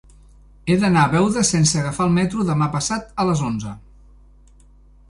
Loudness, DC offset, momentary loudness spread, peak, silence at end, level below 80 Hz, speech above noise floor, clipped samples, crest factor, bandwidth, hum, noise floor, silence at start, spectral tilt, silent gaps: -19 LUFS; under 0.1%; 12 LU; -4 dBFS; 1.3 s; -44 dBFS; 30 dB; under 0.1%; 18 dB; 11.5 kHz; 50 Hz at -35 dBFS; -49 dBFS; 0.65 s; -5 dB/octave; none